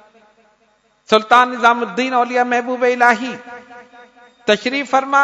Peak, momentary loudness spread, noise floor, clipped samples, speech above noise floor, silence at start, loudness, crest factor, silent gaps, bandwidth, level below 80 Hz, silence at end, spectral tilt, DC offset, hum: 0 dBFS; 14 LU; -59 dBFS; 0.1%; 44 dB; 1.1 s; -15 LUFS; 18 dB; none; 12 kHz; -64 dBFS; 0 s; -3.5 dB/octave; under 0.1%; none